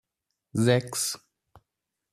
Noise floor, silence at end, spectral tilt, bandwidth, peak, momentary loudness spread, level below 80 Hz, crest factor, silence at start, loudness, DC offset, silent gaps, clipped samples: -84 dBFS; 0.95 s; -4.5 dB/octave; 14.5 kHz; -8 dBFS; 11 LU; -66 dBFS; 22 dB; 0.55 s; -26 LUFS; under 0.1%; none; under 0.1%